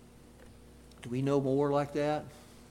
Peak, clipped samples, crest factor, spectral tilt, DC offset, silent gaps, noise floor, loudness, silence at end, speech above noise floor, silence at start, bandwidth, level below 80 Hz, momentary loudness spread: -16 dBFS; under 0.1%; 18 dB; -7.5 dB/octave; under 0.1%; none; -54 dBFS; -31 LUFS; 0.1 s; 24 dB; 0.4 s; 16 kHz; -60 dBFS; 15 LU